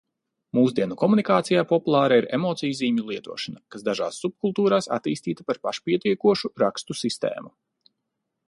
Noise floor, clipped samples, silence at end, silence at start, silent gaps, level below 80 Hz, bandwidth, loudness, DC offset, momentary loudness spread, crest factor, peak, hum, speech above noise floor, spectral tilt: -80 dBFS; under 0.1%; 1 s; 0.55 s; none; -68 dBFS; 11.5 kHz; -24 LUFS; under 0.1%; 10 LU; 18 dB; -6 dBFS; none; 57 dB; -5.5 dB/octave